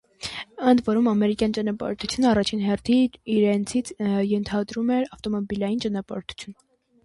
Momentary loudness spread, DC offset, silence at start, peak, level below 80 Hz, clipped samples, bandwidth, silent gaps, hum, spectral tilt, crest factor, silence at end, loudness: 12 LU; under 0.1%; 0.2 s; -6 dBFS; -52 dBFS; under 0.1%; 11.5 kHz; none; none; -5.5 dB/octave; 18 dB; 0.5 s; -24 LUFS